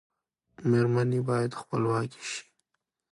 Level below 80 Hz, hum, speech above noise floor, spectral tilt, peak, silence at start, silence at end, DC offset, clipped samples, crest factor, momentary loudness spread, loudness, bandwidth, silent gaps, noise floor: -66 dBFS; none; 55 dB; -6.5 dB/octave; -14 dBFS; 0.6 s; 0.7 s; under 0.1%; under 0.1%; 16 dB; 12 LU; -28 LUFS; 11.5 kHz; none; -83 dBFS